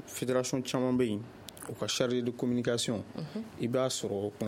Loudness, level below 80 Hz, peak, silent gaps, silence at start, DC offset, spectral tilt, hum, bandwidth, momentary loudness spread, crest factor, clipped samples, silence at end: -32 LUFS; -66 dBFS; -14 dBFS; none; 0 s; under 0.1%; -4.5 dB/octave; none; 16.5 kHz; 10 LU; 18 dB; under 0.1%; 0 s